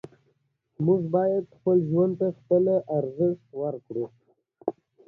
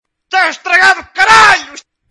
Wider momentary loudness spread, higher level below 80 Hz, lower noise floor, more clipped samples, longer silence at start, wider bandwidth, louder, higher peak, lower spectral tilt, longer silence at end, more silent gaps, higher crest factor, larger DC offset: first, 12 LU vs 8 LU; second, -70 dBFS vs -44 dBFS; first, -71 dBFS vs -33 dBFS; second, under 0.1% vs 1%; first, 0.8 s vs 0.3 s; second, 1.9 kHz vs 12 kHz; second, -26 LUFS vs -8 LUFS; second, -10 dBFS vs 0 dBFS; first, -12.5 dB/octave vs -0.5 dB/octave; about the same, 0.35 s vs 0.35 s; neither; first, 18 dB vs 10 dB; neither